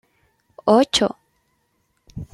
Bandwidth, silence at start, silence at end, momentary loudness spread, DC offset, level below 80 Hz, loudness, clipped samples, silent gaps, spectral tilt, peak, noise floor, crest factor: 13.5 kHz; 0.65 s; 0.1 s; 24 LU; under 0.1%; -52 dBFS; -18 LUFS; under 0.1%; none; -4 dB/octave; -4 dBFS; -68 dBFS; 20 dB